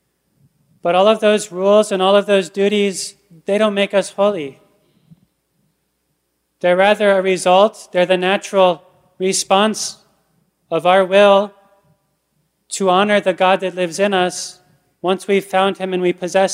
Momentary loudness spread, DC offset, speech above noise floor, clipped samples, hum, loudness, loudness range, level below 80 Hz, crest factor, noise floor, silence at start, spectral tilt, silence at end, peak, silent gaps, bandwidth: 12 LU; under 0.1%; 54 dB; under 0.1%; none; -16 LUFS; 5 LU; -70 dBFS; 16 dB; -69 dBFS; 0.85 s; -4 dB/octave; 0 s; 0 dBFS; none; 15 kHz